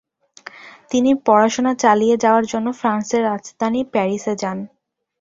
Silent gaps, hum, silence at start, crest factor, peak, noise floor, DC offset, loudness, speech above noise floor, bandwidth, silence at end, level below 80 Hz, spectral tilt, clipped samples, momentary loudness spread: none; none; 0.55 s; 18 dB; -2 dBFS; -42 dBFS; under 0.1%; -18 LUFS; 25 dB; 7.8 kHz; 0.55 s; -60 dBFS; -5 dB/octave; under 0.1%; 15 LU